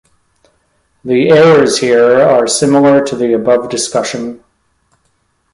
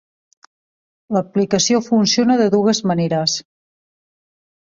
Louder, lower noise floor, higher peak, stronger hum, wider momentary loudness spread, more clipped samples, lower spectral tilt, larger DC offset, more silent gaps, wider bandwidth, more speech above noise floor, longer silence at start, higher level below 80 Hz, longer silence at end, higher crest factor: first, -10 LUFS vs -17 LUFS; second, -60 dBFS vs under -90 dBFS; about the same, 0 dBFS vs -2 dBFS; neither; first, 11 LU vs 7 LU; neither; about the same, -4.5 dB/octave vs -4.5 dB/octave; neither; neither; first, 11.5 kHz vs 7.6 kHz; second, 50 dB vs over 74 dB; about the same, 1.05 s vs 1.1 s; first, -52 dBFS vs -60 dBFS; second, 1.15 s vs 1.35 s; about the same, 12 dB vs 16 dB